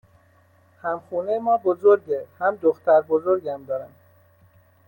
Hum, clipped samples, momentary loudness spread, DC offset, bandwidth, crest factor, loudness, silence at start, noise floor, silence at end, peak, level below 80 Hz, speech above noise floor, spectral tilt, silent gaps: none; under 0.1%; 12 LU; under 0.1%; 17 kHz; 18 dB; -22 LUFS; 0.85 s; -58 dBFS; 1 s; -4 dBFS; -72 dBFS; 36 dB; -8.5 dB/octave; none